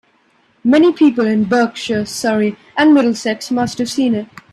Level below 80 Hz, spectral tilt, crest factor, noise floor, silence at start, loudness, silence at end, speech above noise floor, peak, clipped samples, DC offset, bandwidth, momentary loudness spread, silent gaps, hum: -58 dBFS; -5 dB/octave; 14 dB; -56 dBFS; 0.65 s; -15 LUFS; 0.3 s; 42 dB; 0 dBFS; under 0.1%; under 0.1%; 13.5 kHz; 9 LU; none; none